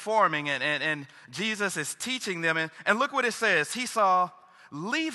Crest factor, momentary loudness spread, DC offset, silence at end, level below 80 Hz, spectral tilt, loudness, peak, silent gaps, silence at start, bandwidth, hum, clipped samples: 20 dB; 8 LU; under 0.1%; 0 s; -78 dBFS; -3 dB/octave; -27 LUFS; -8 dBFS; none; 0 s; 13 kHz; none; under 0.1%